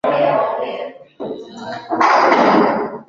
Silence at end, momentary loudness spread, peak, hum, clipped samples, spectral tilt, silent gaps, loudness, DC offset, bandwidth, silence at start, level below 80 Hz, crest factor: 0.05 s; 18 LU; -2 dBFS; none; under 0.1%; -5.5 dB/octave; none; -15 LUFS; under 0.1%; 7.6 kHz; 0.05 s; -60 dBFS; 16 dB